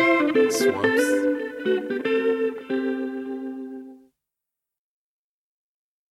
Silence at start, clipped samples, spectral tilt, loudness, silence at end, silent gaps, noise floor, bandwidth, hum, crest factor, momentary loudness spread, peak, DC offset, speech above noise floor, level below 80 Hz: 0 s; under 0.1%; -4 dB/octave; -23 LUFS; 2.15 s; none; -86 dBFS; 15 kHz; none; 16 dB; 14 LU; -8 dBFS; under 0.1%; 65 dB; -68 dBFS